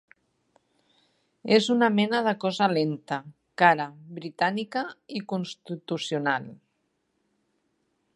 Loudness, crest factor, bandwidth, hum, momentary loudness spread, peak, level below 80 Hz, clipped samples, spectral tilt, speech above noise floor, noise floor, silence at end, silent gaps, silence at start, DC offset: -26 LUFS; 24 dB; 11.5 kHz; none; 16 LU; -4 dBFS; -78 dBFS; under 0.1%; -5.5 dB/octave; 49 dB; -75 dBFS; 1.6 s; none; 1.45 s; under 0.1%